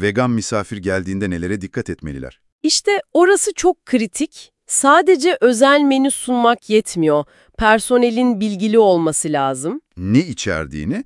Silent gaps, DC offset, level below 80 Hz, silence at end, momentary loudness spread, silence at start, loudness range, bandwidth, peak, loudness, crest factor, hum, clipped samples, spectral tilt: 2.52-2.59 s; under 0.1%; -44 dBFS; 0.05 s; 13 LU; 0 s; 4 LU; 12 kHz; 0 dBFS; -16 LUFS; 16 dB; none; under 0.1%; -4 dB/octave